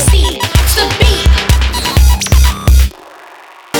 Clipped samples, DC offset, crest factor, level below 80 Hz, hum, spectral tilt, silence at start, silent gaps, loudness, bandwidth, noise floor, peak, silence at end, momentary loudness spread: under 0.1%; under 0.1%; 10 dB; -12 dBFS; none; -4 dB/octave; 0 s; none; -11 LUFS; 19 kHz; -36 dBFS; 0 dBFS; 0 s; 2 LU